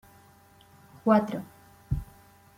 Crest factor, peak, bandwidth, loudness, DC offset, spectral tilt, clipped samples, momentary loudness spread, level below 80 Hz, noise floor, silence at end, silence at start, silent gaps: 22 dB; -10 dBFS; 16 kHz; -28 LUFS; under 0.1%; -8.5 dB/octave; under 0.1%; 23 LU; -46 dBFS; -57 dBFS; 0.55 s; 1.05 s; none